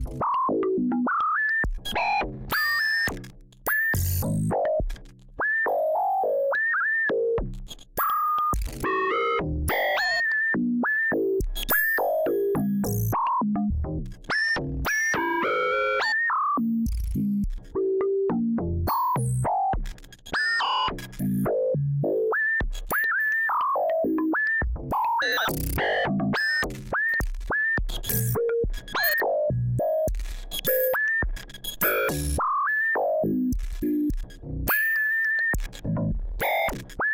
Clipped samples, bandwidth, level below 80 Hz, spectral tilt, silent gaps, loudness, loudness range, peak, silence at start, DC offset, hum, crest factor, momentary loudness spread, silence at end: under 0.1%; 17 kHz; -36 dBFS; -5 dB/octave; none; -25 LUFS; 2 LU; -10 dBFS; 0 s; under 0.1%; none; 14 dB; 7 LU; 0 s